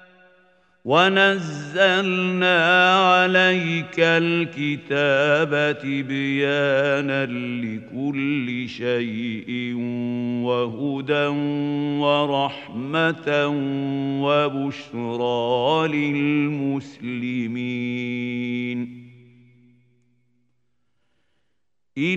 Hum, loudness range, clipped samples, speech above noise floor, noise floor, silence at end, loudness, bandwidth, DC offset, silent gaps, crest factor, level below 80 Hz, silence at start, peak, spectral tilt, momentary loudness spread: none; 11 LU; under 0.1%; 58 dB; -79 dBFS; 0 s; -21 LUFS; 8.6 kHz; under 0.1%; none; 20 dB; -70 dBFS; 0.85 s; -2 dBFS; -6 dB/octave; 12 LU